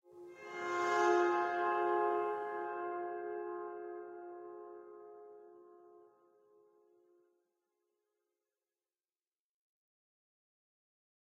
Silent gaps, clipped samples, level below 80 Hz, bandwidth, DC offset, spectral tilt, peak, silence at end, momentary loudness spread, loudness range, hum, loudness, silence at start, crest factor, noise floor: none; under 0.1%; under -90 dBFS; 7.8 kHz; under 0.1%; -4 dB/octave; -18 dBFS; 5.25 s; 23 LU; 21 LU; none; -36 LUFS; 0.1 s; 22 dB; under -90 dBFS